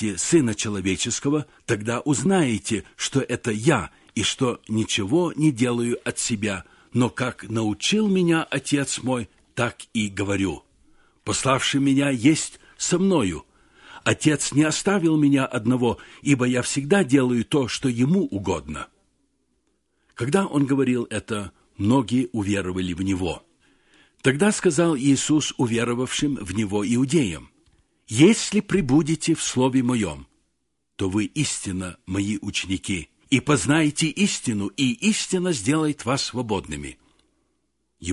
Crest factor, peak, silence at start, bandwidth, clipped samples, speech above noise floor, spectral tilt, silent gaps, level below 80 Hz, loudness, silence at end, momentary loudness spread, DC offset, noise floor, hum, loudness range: 18 dB; -4 dBFS; 0 s; 11.5 kHz; under 0.1%; 53 dB; -4.5 dB/octave; none; -48 dBFS; -23 LUFS; 0 s; 9 LU; under 0.1%; -75 dBFS; none; 4 LU